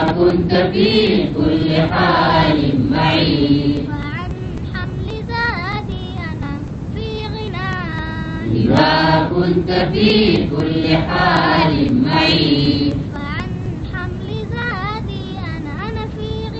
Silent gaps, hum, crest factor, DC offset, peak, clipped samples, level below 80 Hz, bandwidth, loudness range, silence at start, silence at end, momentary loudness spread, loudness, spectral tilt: none; none; 16 dB; 0.2%; 0 dBFS; under 0.1%; -32 dBFS; 8.2 kHz; 9 LU; 0 s; 0 s; 12 LU; -17 LUFS; -7.5 dB/octave